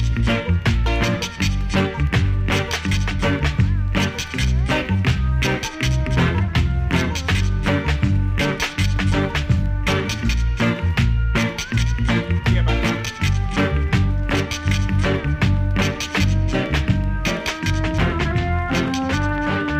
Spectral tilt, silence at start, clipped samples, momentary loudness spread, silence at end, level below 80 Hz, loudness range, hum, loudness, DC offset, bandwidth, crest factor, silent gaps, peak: -5.5 dB/octave; 0 s; under 0.1%; 2 LU; 0 s; -24 dBFS; 0 LU; none; -20 LUFS; under 0.1%; 15.5 kHz; 16 dB; none; -4 dBFS